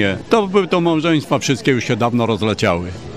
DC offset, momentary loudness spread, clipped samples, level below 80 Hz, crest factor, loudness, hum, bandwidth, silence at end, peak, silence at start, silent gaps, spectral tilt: 0.5%; 3 LU; under 0.1%; -46 dBFS; 14 dB; -17 LUFS; none; 14.5 kHz; 0 s; -2 dBFS; 0 s; none; -5.5 dB/octave